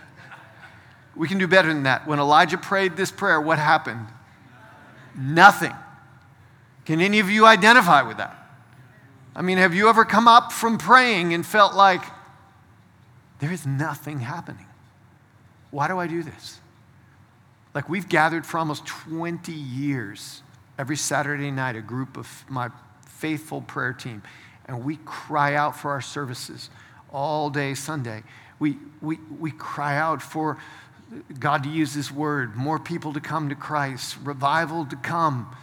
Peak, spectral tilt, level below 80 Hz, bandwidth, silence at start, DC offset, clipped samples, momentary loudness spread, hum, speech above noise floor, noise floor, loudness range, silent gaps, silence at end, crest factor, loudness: 0 dBFS; -4.5 dB/octave; -68 dBFS; over 20 kHz; 0.2 s; under 0.1%; under 0.1%; 21 LU; none; 33 dB; -55 dBFS; 14 LU; none; 0.05 s; 22 dB; -21 LUFS